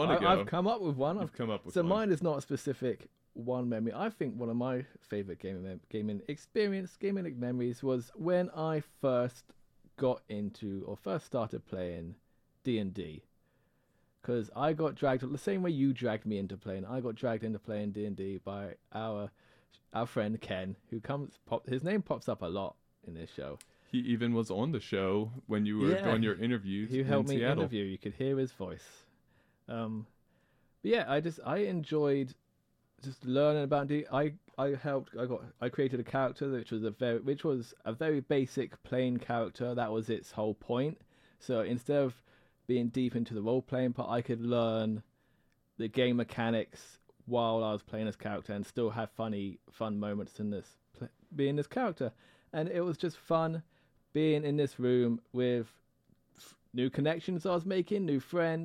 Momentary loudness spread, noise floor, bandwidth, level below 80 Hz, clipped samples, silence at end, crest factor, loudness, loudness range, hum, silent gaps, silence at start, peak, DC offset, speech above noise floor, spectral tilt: 11 LU; -74 dBFS; 14 kHz; -70 dBFS; under 0.1%; 0 s; 20 dB; -34 LUFS; 6 LU; none; none; 0 s; -14 dBFS; under 0.1%; 41 dB; -7.5 dB/octave